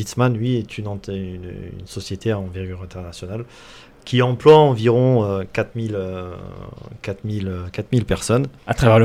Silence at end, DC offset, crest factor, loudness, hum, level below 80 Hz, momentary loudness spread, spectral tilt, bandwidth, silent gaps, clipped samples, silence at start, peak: 0 s; under 0.1%; 18 dB; -19 LUFS; none; -42 dBFS; 19 LU; -6.5 dB/octave; 14 kHz; none; under 0.1%; 0 s; 0 dBFS